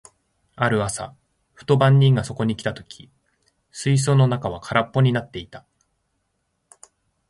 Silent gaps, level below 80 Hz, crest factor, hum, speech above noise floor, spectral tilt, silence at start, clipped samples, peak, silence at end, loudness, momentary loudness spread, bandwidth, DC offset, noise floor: none; -52 dBFS; 20 dB; none; 53 dB; -6 dB/octave; 0.6 s; under 0.1%; -2 dBFS; 1.7 s; -20 LUFS; 21 LU; 11.5 kHz; under 0.1%; -73 dBFS